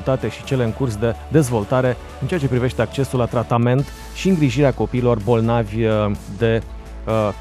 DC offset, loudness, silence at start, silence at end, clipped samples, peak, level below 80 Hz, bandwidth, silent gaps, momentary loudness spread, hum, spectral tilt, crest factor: under 0.1%; -19 LUFS; 0 s; 0 s; under 0.1%; -2 dBFS; -36 dBFS; 14 kHz; none; 6 LU; none; -7 dB/octave; 16 dB